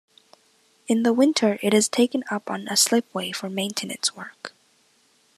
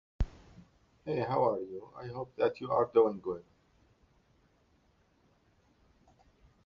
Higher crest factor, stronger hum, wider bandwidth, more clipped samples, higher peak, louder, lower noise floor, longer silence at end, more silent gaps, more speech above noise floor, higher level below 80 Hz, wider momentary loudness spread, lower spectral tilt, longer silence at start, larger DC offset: about the same, 20 dB vs 22 dB; neither; first, 14 kHz vs 6.6 kHz; neither; first, -6 dBFS vs -12 dBFS; first, -22 LUFS vs -33 LUFS; second, -62 dBFS vs -69 dBFS; second, 0.9 s vs 3.25 s; neither; about the same, 39 dB vs 38 dB; second, -80 dBFS vs -50 dBFS; first, 19 LU vs 16 LU; second, -3 dB/octave vs -6.5 dB/octave; first, 0.9 s vs 0.2 s; neither